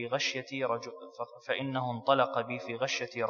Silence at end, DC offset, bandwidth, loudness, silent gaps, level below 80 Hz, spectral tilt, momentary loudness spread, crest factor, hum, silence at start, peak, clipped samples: 0 s; under 0.1%; 7.2 kHz; -32 LUFS; none; -86 dBFS; -4 dB/octave; 15 LU; 22 dB; none; 0 s; -12 dBFS; under 0.1%